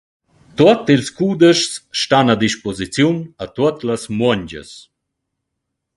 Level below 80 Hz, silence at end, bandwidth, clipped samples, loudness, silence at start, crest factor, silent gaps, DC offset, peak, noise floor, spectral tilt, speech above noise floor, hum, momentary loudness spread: -50 dBFS; 1.15 s; 11.5 kHz; under 0.1%; -16 LUFS; 0.6 s; 18 dB; none; under 0.1%; 0 dBFS; -77 dBFS; -5 dB/octave; 61 dB; none; 12 LU